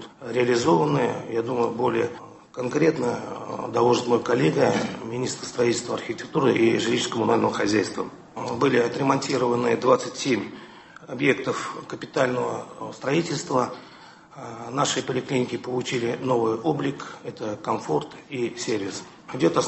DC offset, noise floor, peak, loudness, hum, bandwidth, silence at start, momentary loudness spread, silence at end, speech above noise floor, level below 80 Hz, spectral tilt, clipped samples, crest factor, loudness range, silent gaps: under 0.1%; -47 dBFS; -6 dBFS; -24 LUFS; none; 8.6 kHz; 0 s; 14 LU; 0 s; 23 dB; -62 dBFS; -5 dB/octave; under 0.1%; 20 dB; 4 LU; none